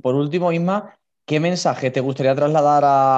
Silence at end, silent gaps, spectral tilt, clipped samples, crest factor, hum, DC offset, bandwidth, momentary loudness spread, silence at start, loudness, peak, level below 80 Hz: 0 s; none; -6.5 dB/octave; under 0.1%; 12 dB; none; under 0.1%; 8.4 kHz; 7 LU; 0.05 s; -18 LUFS; -6 dBFS; -68 dBFS